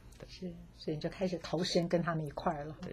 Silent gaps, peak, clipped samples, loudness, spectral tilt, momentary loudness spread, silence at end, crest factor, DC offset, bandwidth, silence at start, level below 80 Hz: none; -18 dBFS; under 0.1%; -36 LUFS; -5.5 dB/octave; 14 LU; 0 s; 18 dB; under 0.1%; 14 kHz; 0 s; -58 dBFS